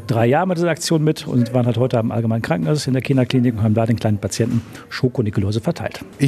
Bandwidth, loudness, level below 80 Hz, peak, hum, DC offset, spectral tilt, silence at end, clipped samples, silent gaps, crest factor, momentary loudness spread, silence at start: 14 kHz; -19 LUFS; -52 dBFS; -2 dBFS; none; under 0.1%; -6.5 dB/octave; 0 s; under 0.1%; none; 16 dB; 5 LU; 0 s